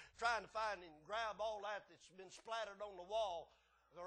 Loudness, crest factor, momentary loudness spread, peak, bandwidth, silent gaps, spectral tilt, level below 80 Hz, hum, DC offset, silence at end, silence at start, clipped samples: -45 LUFS; 20 dB; 18 LU; -26 dBFS; 10 kHz; none; -2 dB/octave; -76 dBFS; none; under 0.1%; 0 s; 0 s; under 0.1%